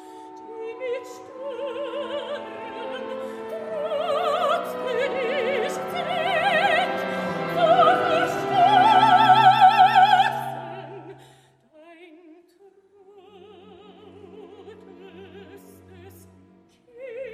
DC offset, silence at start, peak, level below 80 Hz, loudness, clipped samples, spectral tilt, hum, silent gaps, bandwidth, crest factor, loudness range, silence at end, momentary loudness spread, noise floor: under 0.1%; 0 s; -4 dBFS; -68 dBFS; -21 LUFS; under 0.1%; -4.5 dB/octave; none; none; 15 kHz; 20 dB; 15 LU; 0 s; 21 LU; -55 dBFS